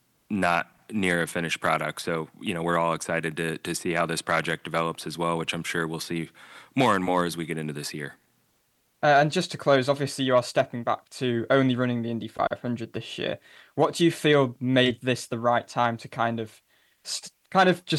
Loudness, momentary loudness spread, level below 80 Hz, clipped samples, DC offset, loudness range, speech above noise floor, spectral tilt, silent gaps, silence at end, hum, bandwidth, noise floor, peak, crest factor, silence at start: -26 LUFS; 11 LU; -64 dBFS; under 0.1%; under 0.1%; 3 LU; 44 dB; -5 dB/octave; none; 0 s; none; 12.5 kHz; -69 dBFS; -6 dBFS; 20 dB; 0.3 s